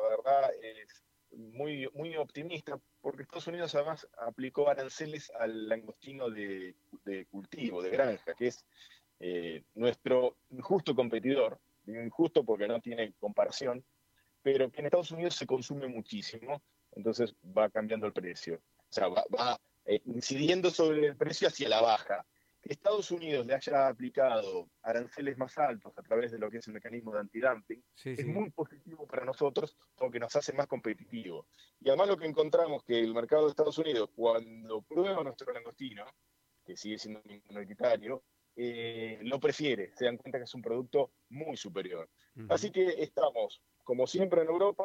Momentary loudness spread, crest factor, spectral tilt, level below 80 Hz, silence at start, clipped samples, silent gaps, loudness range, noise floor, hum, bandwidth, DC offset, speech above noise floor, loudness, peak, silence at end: 15 LU; 20 dB; -5 dB/octave; -78 dBFS; 0 s; under 0.1%; none; 7 LU; -73 dBFS; none; 13.5 kHz; under 0.1%; 40 dB; -33 LUFS; -14 dBFS; 0 s